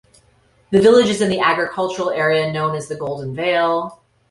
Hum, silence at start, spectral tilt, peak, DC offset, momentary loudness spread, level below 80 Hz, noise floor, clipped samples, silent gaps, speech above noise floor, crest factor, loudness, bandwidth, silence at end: none; 0.7 s; -5 dB/octave; -2 dBFS; under 0.1%; 13 LU; -54 dBFS; -56 dBFS; under 0.1%; none; 39 dB; 16 dB; -17 LUFS; 11.5 kHz; 0.35 s